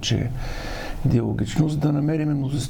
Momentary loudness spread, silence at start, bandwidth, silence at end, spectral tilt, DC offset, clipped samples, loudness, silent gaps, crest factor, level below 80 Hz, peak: 10 LU; 0 s; 17.5 kHz; 0 s; -6.5 dB/octave; under 0.1%; under 0.1%; -24 LUFS; none; 16 dB; -34 dBFS; -8 dBFS